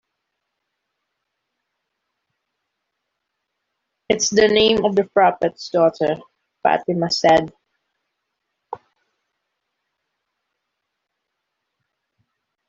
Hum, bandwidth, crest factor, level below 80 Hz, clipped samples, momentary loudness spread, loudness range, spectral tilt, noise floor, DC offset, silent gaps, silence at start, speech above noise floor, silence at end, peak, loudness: none; 7.8 kHz; 20 dB; -58 dBFS; under 0.1%; 20 LU; 6 LU; -3.5 dB/octave; -78 dBFS; under 0.1%; none; 4.1 s; 61 dB; 3.95 s; -2 dBFS; -18 LUFS